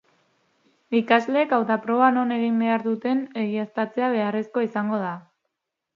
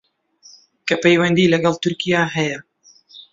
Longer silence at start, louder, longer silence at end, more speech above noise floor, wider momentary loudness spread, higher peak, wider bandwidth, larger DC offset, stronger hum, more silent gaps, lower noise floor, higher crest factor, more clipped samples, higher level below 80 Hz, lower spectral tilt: about the same, 0.9 s vs 0.85 s; second, -23 LUFS vs -17 LUFS; first, 0.75 s vs 0.1 s; first, 58 dB vs 34 dB; second, 7 LU vs 10 LU; about the same, -2 dBFS vs -2 dBFS; second, 6.8 kHz vs 7.8 kHz; neither; neither; neither; first, -80 dBFS vs -51 dBFS; about the same, 22 dB vs 18 dB; neither; second, -76 dBFS vs -58 dBFS; first, -7.5 dB/octave vs -5.5 dB/octave